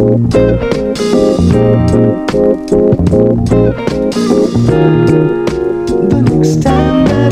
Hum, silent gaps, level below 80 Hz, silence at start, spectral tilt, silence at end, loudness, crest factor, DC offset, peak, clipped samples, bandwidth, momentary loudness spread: none; none; -26 dBFS; 0 s; -7.5 dB/octave; 0 s; -10 LUFS; 10 dB; under 0.1%; 0 dBFS; 0.4%; 12 kHz; 5 LU